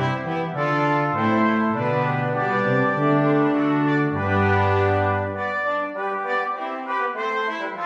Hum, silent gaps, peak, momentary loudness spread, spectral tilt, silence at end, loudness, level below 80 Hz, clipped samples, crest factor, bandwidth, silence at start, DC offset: none; none; -8 dBFS; 6 LU; -8 dB/octave; 0 s; -22 LUFS; -64 dBFS; under 0.1%; 14 dB; 7.4 kHz; 0 s; under 0.1%